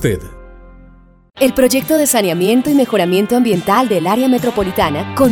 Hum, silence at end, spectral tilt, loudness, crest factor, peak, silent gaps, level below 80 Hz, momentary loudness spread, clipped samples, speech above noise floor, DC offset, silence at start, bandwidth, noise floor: none; 0 s; -4.5 dB/octave; -14 LUFS; 14 dB; 0 dBFS; none; -40 dBFS; 4 LU; under 0.1%; 30 dB; under 0.1%; 0 s; 19 kHz; -43 dBFS